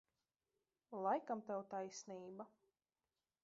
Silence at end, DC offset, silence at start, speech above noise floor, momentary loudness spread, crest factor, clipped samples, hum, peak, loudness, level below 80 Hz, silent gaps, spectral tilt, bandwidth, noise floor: 0.95 s; under 0.1%; 0.9 s; over 44 dB; 14 LU; 22 dB; under 0.1%; none; -26 dBFS; -46 LUFS; under -90 dBFS; none; -4.5 dB/octave; 7.4 kHz; under -90 dBFS